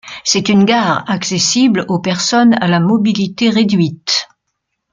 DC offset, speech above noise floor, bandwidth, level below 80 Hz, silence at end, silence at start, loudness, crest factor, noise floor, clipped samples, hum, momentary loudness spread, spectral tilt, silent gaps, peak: under 0.1%; 60 dB; 9.4 kHz; -54 dBFS; 0.7 s; 0.05 s; -13 LUFS; 12 dB; -72 dBFS; under 0.1%; none; 5 LU; -4 dB/octave; none; 0 dBFS